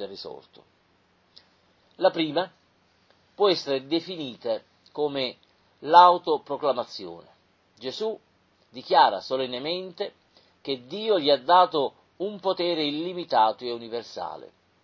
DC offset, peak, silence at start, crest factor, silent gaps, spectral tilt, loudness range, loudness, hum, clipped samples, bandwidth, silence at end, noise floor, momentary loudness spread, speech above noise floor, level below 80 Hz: under 0.1%; -2 dBFS; 0 s; 24 dB; none; -5 dB/octave; 6 LU; -25 LUFS; none; under 0.1%; 7.2 kHz; 0.4 s; -65 dBFS; 19 LU; 40 dB; -74 dBFS